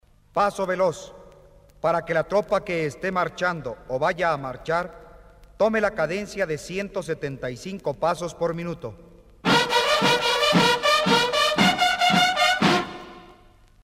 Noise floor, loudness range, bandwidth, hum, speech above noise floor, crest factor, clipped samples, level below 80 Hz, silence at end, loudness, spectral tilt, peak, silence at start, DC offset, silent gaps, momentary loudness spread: -53 dBFS; 8 LU; 16 kHz; none; 28 dB; 18 dB; under 0.1%; -52 dBFS; 0.5 s; -22 LUFS; -3.5 dB/octave; -6 dBFS; 0.35 s; under 0.1%; none; 13 LU